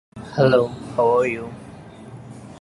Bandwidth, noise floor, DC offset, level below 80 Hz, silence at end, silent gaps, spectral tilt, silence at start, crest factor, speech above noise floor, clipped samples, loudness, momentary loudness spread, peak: 11.5 kHz; -40 dBFS; under 0.1%; -52 dBFS; 0 s; none; -7 dB/octave; 0.15 s; 18 dB; 21 dB; under 0.1%; -20 LUFS; 23 LU; -4 dBFS